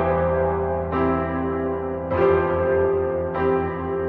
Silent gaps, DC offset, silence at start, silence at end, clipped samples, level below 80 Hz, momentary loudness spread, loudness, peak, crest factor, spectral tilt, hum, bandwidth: none; under 0.1%; 0 s; 0 s; under 0.1%; -38 dBFS; 6 LU; -22 LUFS; -8 dBFS; 14 dB; -10.5 dB/octave; none; 4.4 kHz